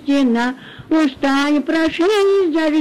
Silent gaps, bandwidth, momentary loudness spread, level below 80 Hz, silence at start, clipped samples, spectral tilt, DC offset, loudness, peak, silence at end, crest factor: none; 12.5 kHz; 5 LU; -52 dBFS; 0 s; under 0.1%; -4.5 dB/octave; under 0.1%; -16 LUFS; -8 dBFS; 0 s; 8 dB